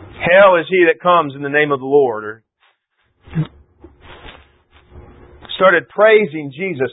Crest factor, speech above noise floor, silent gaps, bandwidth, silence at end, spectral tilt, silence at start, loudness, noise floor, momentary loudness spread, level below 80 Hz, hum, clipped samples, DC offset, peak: 16 dB; 51 dB; none; 4 kHz; 0 s; -11 dB/octave; 0 s; -14 LUFS; -64 dBFS; 16 LU; -50 dBFS; none; under 0.1%; under 0.1%; 0 dBFS